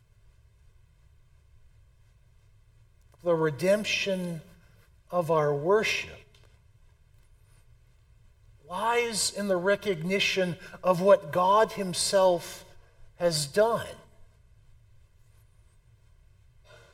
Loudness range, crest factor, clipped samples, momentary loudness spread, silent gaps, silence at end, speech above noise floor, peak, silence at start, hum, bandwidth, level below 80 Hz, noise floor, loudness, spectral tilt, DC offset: 8 LU; 22 dB; under 0.1%; 11 LU; none; 2.7 s; 33 dB; -8 dBFS; 3.25 s; none; 16.5 kHz; -60 dBFS; -59 dBFS; -26 LUFS; -3.5 dB/octave; under 0.1%